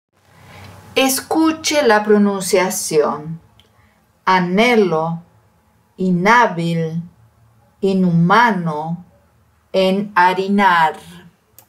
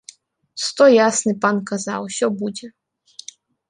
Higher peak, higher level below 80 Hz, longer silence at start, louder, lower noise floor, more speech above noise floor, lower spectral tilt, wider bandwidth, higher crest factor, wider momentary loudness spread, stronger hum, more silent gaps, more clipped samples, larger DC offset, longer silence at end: about the same, -2 dBFS vs -2 dBFS; first, -58 dBFS vs -68 dBFS; about the same, 0.55 s vs 0.55 s; first, -15 LUFS vs -18 LUFS; first, -56 dBFS vs -47 dBFS; first, 41 dB vs 29 dB; first, -5 dB/octave vs -3.5 dB/octave; first, 16 kHz vs 11.5 kHz; about the same, 16 dB vs 18 dB; second, 12 LU vs 25 LU; neither; neither; neither; neither; second, 0.5 s vs 1 s